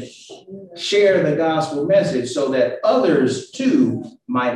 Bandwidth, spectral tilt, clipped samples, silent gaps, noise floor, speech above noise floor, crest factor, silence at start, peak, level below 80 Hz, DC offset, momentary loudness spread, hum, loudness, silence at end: 11.5 kHz; -5.5 dB/octave; under 0.1%; none; -39 dBFS; 21 dB; 14 dB; 0 s; -4 dBFS; -60 dBFS; under 0.1%; 14 LU; none; -18 LUFS; 0 s